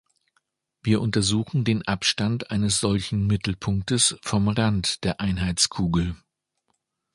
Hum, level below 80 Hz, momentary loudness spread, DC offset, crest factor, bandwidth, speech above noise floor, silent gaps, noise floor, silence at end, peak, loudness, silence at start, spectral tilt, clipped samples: none; -42 dBFS; 5 LU; under 0.1%; 18 dB; 11.5 kHz; 52 dB; none; -75 dBFS; 1 s; -6 dBFS; -23 LUFS; 0.85 s; -4 dB/octave; under 0.1%